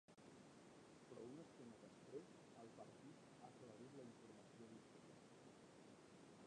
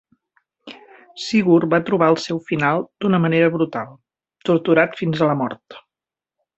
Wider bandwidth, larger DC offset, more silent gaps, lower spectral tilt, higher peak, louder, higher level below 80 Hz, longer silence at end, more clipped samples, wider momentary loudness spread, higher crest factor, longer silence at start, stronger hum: first, 10 kHz vs 8 kHz; neither; neither; second, -5.5 dB/octave vs -7 dB/octave; second, -44 dBFS vs -2 dBFS; second, -63 LUFS vs -19 LUFS; second, under -90 dBFS vs -60 dBFS; second, 0 s vs 0.8 s; neither; second, 6 LU vs 13 LU; about the same, 18 dB vs 18 dB; second, 0.1 s vs 0.65 s; neither